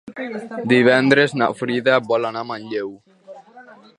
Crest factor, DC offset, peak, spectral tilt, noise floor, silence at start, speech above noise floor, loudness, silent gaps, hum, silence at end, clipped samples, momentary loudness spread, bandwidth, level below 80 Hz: 20 dB; under 0.1%; 0 dBFS; -6 dB/octave; -45 dBFS; 0.05 s; 26 dB; -18 LUFS; none; none; 0.25 s; under 0.1%; 15 LU; 11 kHz; -66 dBFS